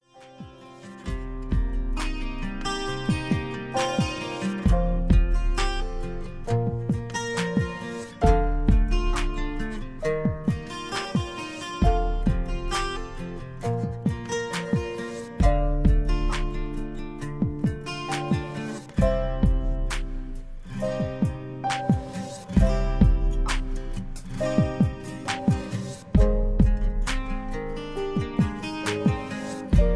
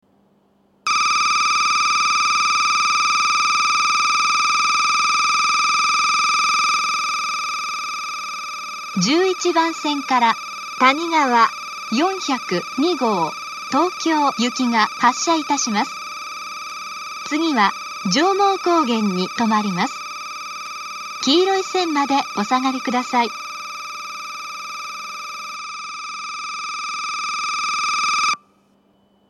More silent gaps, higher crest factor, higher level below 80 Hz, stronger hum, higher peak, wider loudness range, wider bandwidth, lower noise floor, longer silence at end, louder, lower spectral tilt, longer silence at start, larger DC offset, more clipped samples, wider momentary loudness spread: neither; about the same, 18 dB vs 20 dB; first, -28 dBFS vs -76 dBFS; neither; second, -6 dBFS vs 0 dBFS; second, 3 LU vs 8 LU; second, 11 kHz vs 12.5 kHz; second, -45 dBFS vs -59 dBFS; second, 0 s vs 0.95 s; second, -27 LUFS vs -19 LUFS; first, -6.5 dB/octave vs -2.5 dB/octave; second, 0.15 s vs 0.85 s; neither; neither; about the same, 12 LU vs 13 LU